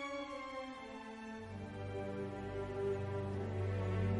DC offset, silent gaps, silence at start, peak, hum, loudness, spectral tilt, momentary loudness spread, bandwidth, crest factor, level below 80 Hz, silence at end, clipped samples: under 0.1%; none; 0 s; -26 dBFS; none; -42 LUFS; -7.5 dB/octave; 9 LU; 10.5 kHz; 16 dB; -60 dBFS; 0 s; under 0.1%